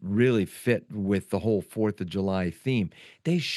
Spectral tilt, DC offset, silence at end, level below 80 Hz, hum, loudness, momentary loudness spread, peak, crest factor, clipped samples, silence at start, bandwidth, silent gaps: -6.5 dB/octave; under 0.1%; 0 s; -66 dBFS; none; -28 LUFS; 6 LU; -10 dBFS; 16 dB; under 0.1%; 0 s; 12.5 kHz; none